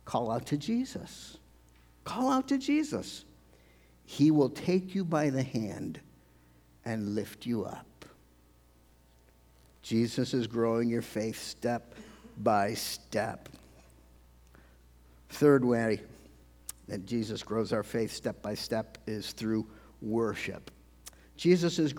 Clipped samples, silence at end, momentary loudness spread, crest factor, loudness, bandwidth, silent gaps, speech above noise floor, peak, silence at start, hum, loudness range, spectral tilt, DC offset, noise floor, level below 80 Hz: under 0.1%; 0 s; 20 LU; 22 dB; -31 LUFS; 19.5 kHz; none; 31 dB; -12 dBFS; 0.05 s; 60 Hz at -60 dBFS; 7 LU; -6 dB/octave; under 0.1%; -62 dBFS; -62 dBFS